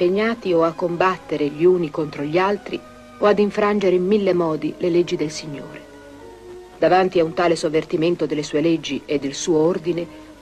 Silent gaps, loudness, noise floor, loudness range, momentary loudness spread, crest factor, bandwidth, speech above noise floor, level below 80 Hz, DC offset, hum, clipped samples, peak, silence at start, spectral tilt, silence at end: none; -20 LUFS; -40 dBFS; 2 LU; 14 LU; 16 dB; 10.5 kHz; 21 dB; -54 dBFS; under 0.1%; none; under 0.1%; -4 dBFS; 0 s; -5.5 dB/octave; 0.1 s